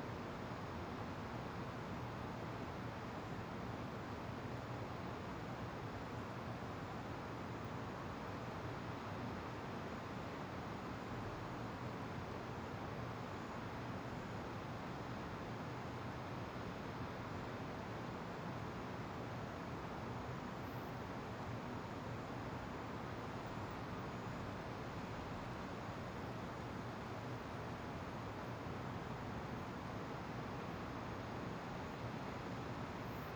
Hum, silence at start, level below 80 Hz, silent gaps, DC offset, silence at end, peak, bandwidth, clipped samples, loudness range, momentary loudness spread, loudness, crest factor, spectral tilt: none; 0 s; -62 dBFS; none; under 0.1%; 0 s; -32 dBFS; over 20 kHz; under 0.1%; 0 LU; 1 LU; -47 LUFS; 14 dB; -6.5 dB/octave